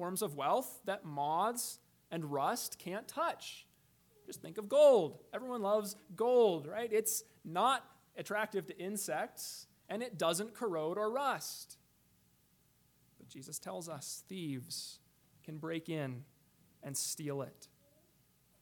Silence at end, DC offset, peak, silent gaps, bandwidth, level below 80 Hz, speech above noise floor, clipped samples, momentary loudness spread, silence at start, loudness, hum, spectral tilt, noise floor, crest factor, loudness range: 0.95 s; under 0.1%; -16 dBFS; none; 19 kHz; -82 dBFS; 35 dB; under 0.1%; 17 LU; 0 s; -36 LUFS; none; -3.5 dB/octave; -71 dBFS; 20 dB; 12 LU